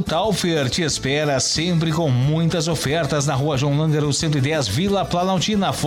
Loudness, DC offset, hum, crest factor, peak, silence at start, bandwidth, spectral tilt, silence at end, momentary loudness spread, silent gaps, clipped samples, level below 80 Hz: -19 LUFS; under 0.1%; none; 10 dB; -10 dBFS; 0 s; 16.5 kHz; -5 dB/octave; 0 s; 2 LU; none; under 0.1%; -42 dBFS